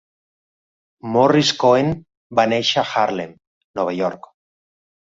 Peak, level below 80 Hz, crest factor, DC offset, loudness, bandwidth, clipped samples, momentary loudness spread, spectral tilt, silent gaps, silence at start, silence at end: -2 dBFS; -56 dBFS; 18 dB; under 0.1%; -18 LUFS; 7.8 kHz; under 0.1%; 17 LU; -4.5 dB/octave; 2.17-2.30 s, 3.47-3.74 s; 1.05 s; 0.85 s